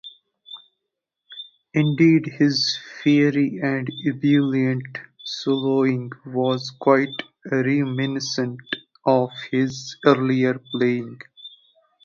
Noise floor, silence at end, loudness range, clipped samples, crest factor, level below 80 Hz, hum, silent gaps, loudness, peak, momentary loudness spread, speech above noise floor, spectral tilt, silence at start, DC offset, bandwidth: -82 dBFS; 0.55 s; 3 LU; under 0.1%; 22 dB; -66 dBFS; none; none; -21 LUFS; 0 dBFS; 20 LU; 61 dB; -6 dB/octave; 0.05 s; under 0.1%; 7.4 kHz